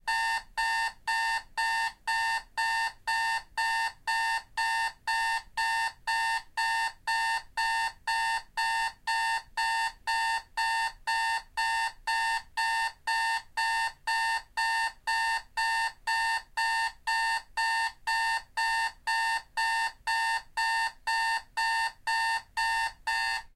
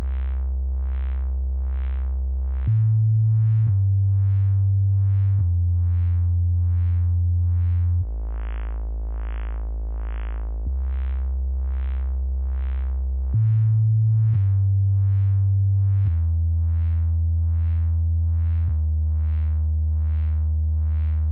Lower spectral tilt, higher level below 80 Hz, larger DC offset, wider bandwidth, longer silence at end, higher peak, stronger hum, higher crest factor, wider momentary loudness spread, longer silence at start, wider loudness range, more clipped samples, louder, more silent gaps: second, 2.5 dB/octave vs -10.5 dB/octave; second, -58 dBFS vs -26 dBFS; neither; first, 16 kHz vs 2.8 kHz; about the same, 0.1 s vs 0 s; second, -18 dBFS vs -12 dBFS; neither; about the same, 12 dB vs 8 dB; second, 2 LU vs 11 LU; about the same, 0.05 s vs 0 s; second, 1 LU vs 7 LU; neither; second, -29 LUFS vs -23 LUFS; neither